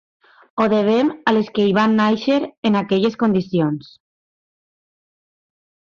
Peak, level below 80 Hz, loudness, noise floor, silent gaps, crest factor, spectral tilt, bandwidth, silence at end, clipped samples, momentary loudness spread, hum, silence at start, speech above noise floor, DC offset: -4 dBFS; -60 dBFS; -18 LUFS; under -90 dBFS; 2.57-2.63 s; 14 dB; -7 dB/octave; 7 kHz; 2.1 s; under 0.1%; 5 LU; none; 0.55 s; over 73 dB; under 0.1%